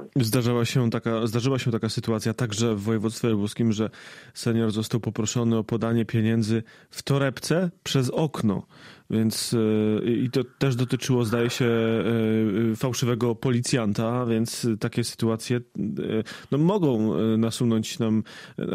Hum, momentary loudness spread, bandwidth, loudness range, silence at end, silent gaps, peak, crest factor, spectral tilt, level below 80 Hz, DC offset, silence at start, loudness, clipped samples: none; 5 LU; 15.5 kHz; 2 LU; 0 s; none; -10 dBFS; 14 dB; -6 dB/octave; -60 dBFS; under 0.1%; 0 s; -25 LUFS; under 0.1%